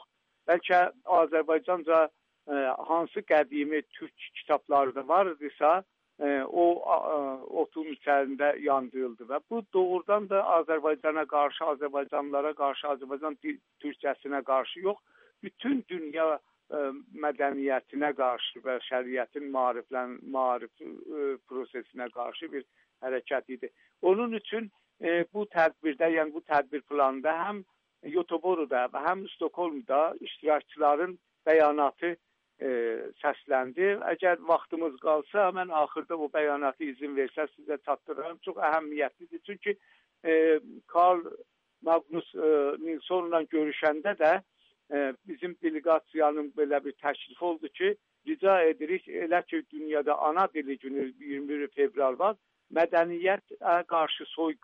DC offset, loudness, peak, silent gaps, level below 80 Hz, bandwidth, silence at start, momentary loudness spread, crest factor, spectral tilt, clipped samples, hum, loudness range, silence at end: under 0.1%; -29 LUFS; -12 dBFS; none; -82 dBFS; 5.4 kHz; 0.45 s; 11 LU; 18 dB; -7 dB/octave; under 0.1%; none; 5 LU; 0.1 s